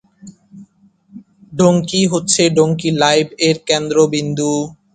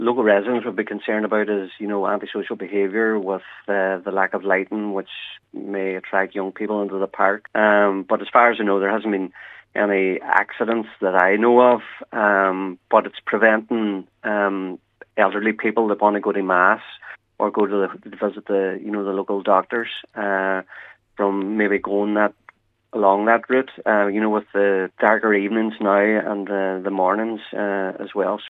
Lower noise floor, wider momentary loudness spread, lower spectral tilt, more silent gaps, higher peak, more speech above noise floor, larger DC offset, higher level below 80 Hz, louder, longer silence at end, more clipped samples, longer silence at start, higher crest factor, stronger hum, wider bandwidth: about the same, -51 dBFS vs -53 dBFS; second, 5 LU vs 10 LU; second, -4.5 dB/octave vs -8 dB/octave; neither; about the same, 0 dBFS vs 0 dBFS; first, 37 dB vs 33 dB; neither; first, -54 dBFS vs -72 dBFS; first, -15 LUFS vs -20 LUFS; first, 0.2 s vs 0 s; neither; first, 0.25 s vs 0 s; about the same, 16 dB vs 20 dB; neither; first, 9.6 kHz vs 4.1 kHz